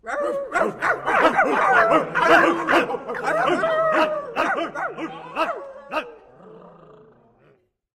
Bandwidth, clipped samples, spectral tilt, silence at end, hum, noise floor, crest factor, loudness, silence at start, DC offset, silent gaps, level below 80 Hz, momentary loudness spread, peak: 14.5 kHz; under 0.1%; -4.5 dB/octave; 1.3 s; none; -60 dBFS; 18 dB; -20 LUFS; 0.05 s; under 0.1%; none; -58 dBFS; 13 LU; -4 dBFS